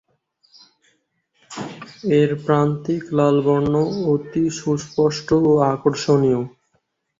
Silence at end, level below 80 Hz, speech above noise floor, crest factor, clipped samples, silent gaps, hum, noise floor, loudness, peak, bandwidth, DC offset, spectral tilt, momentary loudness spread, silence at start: 0.7 s; -54 dBFS; 51 dB; 16 dB; under 0.1%; none; none; -69 dBFS; -19 LUFS; -4 dBFS; 7.8 kHz; under 0.1%; -7 dB/octave; 15 LU; 1.5 s